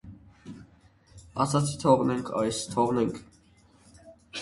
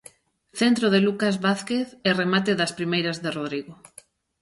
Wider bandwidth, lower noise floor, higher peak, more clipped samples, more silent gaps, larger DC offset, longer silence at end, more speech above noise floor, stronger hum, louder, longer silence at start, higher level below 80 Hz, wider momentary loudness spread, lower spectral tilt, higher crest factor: about the same, 11.5 kHz vs 11.5 kHz; first, -59 dBFS vs -53 dBFS; about the same, -6 dBFS vs -6 dBFS; neither; neither; neither; second, 0 s vs 0.65 s; first, 34 dB vs 30 dB; neither; second, -27 LUFS vs -23 LUFS; second, 0.05 s vs 0.55 s; first, -58 dBFS vs -66 dBFS; first, 24 LU vs 10 LU; about the same, -5.5 dB/octave vs -5 dB/octave; about the same, 22 dB vs 18 dB